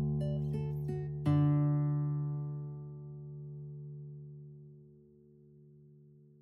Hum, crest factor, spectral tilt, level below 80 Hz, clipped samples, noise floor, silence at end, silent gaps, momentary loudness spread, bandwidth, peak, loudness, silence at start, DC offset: none; 16 dB; -10.5 dB/octave; -58 dBFS; under 0.1%; -60 dBFS; 0.3 s; none; 20 LU; 3.4 kHz; -20 dBFS; -35 LUFS; 0 s; under 0.1%